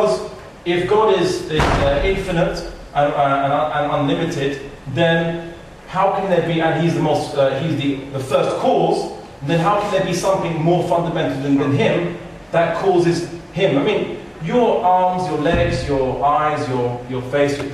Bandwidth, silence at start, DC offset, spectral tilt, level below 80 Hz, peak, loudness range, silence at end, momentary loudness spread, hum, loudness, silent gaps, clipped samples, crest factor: 13.5 kHz; 0 s; under 0.1%; -6 dB/octave; -36 dBFS; -4 dBFS; 2 LU; 0 s; 9 LU; none; -18 LUFS; none; under 0.1%; 14 dB